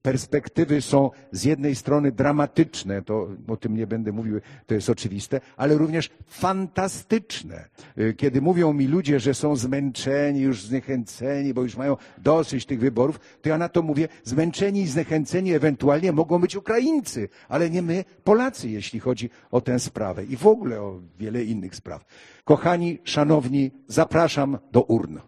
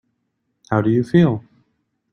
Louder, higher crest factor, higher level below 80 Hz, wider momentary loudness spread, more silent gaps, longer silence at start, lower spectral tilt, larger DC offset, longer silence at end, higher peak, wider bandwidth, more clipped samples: second, -23 LUFS vs -18 LUFS; about the same, 22 dB vs 18 dB; about the same, -56 dBFS vs -54 dBFS; about the same, 10 LU vs 8 LU; neither; second, 0.05 s vs 0.7 s; second, -6.5 dB/octave vs -9 dB/octave; neither; second, 0.05 s vs 0.75 s; about the same, 0 dBFS vs -2 dBFS; first, 13 kHz vs 6.8 kHz; neither